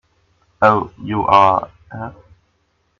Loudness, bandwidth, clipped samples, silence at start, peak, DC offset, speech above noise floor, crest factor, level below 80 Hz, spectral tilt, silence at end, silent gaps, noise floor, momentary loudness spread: -15 LUFS; 7.4 kHz; under 0.1%; 0.6 s; 0 dBFS; under 0.1%; 49 dB; 18 dB; -50 dBFS; -7 dB/octave; 0.9 s; none; -64 dBFS; 20 LU